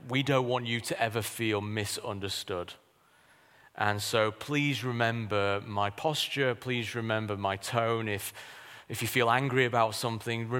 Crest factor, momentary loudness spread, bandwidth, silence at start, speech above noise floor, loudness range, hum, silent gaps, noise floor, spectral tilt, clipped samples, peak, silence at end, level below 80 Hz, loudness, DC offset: 22 dB; 9 LU; 16.5 kHz; 0 s; 33 dB; 4 LU; none; none; -63 dBFS; -4.5 dB/octave; under 0.1%; -10 dBFS; 0 s; -68 dBFS; -30 LUFS; under 0.1%